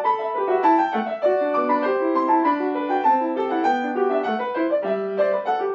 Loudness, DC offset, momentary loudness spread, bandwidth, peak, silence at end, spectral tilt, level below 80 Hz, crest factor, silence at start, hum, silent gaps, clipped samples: -21 LUFS; under 0.1%; 4 LU; 7 kHz; -8 dBFS; 0 s; -6.5 dB/octave; -88 dBFS; 14 dB; 0 s; none; none; under 0.1%